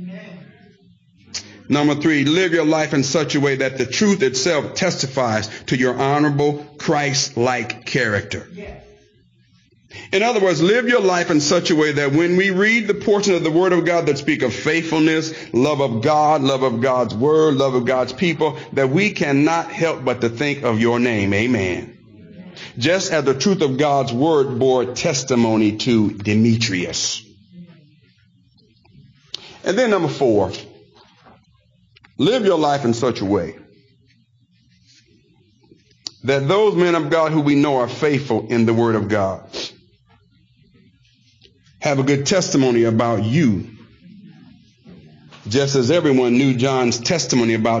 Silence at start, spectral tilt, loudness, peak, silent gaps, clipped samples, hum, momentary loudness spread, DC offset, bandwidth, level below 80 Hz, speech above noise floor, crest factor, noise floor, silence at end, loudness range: 0 s; -5 dB/octave; -18 LUFS; -6 dBFS; none; under 0.1%; none; 9 LU; under 0.1%; 7.6 kHz; -56 dBFS; 40 dB; 12 dB; -58 dBFS; 0 s; 6 LU